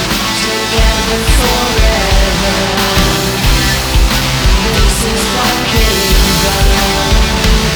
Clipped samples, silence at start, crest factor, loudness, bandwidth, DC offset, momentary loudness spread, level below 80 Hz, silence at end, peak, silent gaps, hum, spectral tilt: under 0.1%; 0 s; 10 dB; -11 LUFS; over 20 kHz; under 0.1%; 2 LU; -14 dBFS; 0 s; 0 dBFS; none; none; -3.5 dB/octave